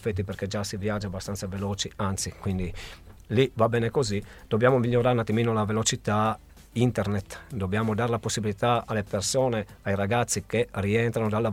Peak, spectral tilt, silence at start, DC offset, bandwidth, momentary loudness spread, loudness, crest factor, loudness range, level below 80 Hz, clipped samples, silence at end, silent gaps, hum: -6 dBFS; -5 dB/octave; 0 s; under 0.1%; 16 kHz; 9 LU; -27 LUFS; 20 dB; 4 LU; -48 dBFS; under 0.1%; 0 s; none; none